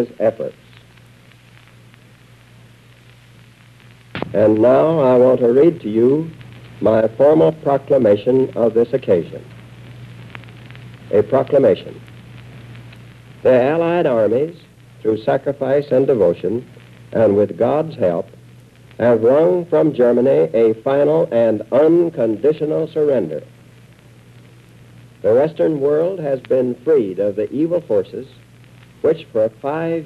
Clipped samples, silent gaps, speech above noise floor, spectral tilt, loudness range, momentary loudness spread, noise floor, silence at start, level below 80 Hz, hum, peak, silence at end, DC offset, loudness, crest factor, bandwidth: under 0.1%; none; 31 dB; -9 dB/octave; 6 LU; 16 LU; -46 dBFS; 0 s; -56 dBFS; none; -4 dBFS; 0 s; under 0.1%; -16 LUFS; 14 dB; 8.2 kHz